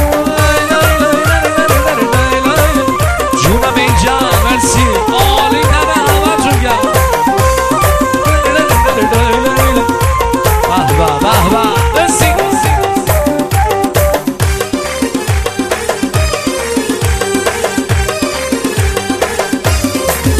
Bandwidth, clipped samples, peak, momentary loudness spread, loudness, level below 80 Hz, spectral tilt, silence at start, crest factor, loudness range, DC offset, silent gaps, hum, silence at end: 14.5 kHz; under 0.1%; 0 dBFS; 5 LU; -11 LUFS; -20 dBFS; -4.5 dB/octave; 0 s; 10 dB; 4 LU; under 0.1%; none; none; 0 s